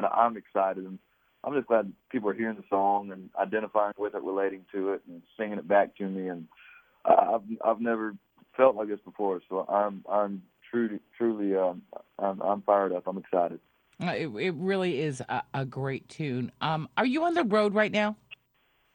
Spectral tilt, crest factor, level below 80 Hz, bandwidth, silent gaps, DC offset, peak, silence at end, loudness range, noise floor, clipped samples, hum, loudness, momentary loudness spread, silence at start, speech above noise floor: -7 dB/octave; 22 dB; -74 dBFS; 17 kHz; none; under 0.1%; -6 dBFS; 0.6 s; 3 LU; -70 dBFS; under 0.1%; none; -29 LUFS; 11 LU; 0 s; 41 dB